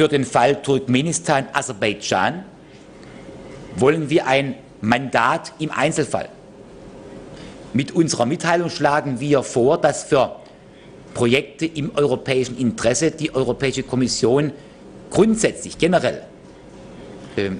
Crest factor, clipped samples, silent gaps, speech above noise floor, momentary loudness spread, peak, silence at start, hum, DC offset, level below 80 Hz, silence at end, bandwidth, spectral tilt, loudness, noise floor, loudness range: 16 dB; under 0.1%; none; 24 dB; 21 LU; -4 dBFS; 0 s; none; under 0.1%; -50 dBFS; 0 s; 11 kHz; -4.5 dB/octave; -19 LUFS; -43 dBFS; 3 LU